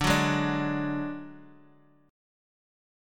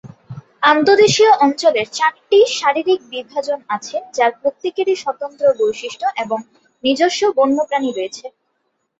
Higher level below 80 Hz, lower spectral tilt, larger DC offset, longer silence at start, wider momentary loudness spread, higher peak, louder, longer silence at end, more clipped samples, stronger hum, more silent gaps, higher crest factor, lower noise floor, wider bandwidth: first, -50 dBFS vs -62 dBFS; first, -5 dB/octave vs -3.5 dB/octave; neither; about the same, 0 s vs 0.05 s; first, 17 LU vs 13 LU; second, -10 dBFS vs -2 dBFS; second, -28 LUFS vs -16 LUFS; first, 1.6 s vs 0.7 s; neither; neither; neither; first, 22 dB vs 16 dB; second, -59 dBFS vs -69 dBFS; first, 17.5 kHz vs 8 kHz